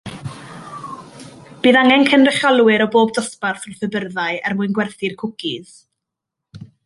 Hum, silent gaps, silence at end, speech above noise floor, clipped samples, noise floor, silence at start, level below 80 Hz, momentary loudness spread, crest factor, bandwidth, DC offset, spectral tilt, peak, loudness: none; none; 0.2 s; 66 dB; under 0.1%; -82 dBFS; 0.05 s; -60 dBFS; 21 LU; 18 dB; 11.5 kHz; under 0.1%; -4.5 dB/octave; 0 dBFS; -16 LUFS